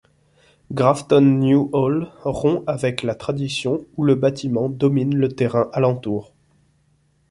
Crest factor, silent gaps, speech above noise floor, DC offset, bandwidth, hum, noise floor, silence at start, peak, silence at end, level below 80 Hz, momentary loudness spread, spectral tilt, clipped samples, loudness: 18 dB; none; 43 dB; under 0.1%; 11.5 kHz; none; -61 dBFS; 0.7 s; -2 dBFS; 1.05 s; -54 dBFS; 10 LU; -7.5 dB/octave; under 0.1%; -20 LUFS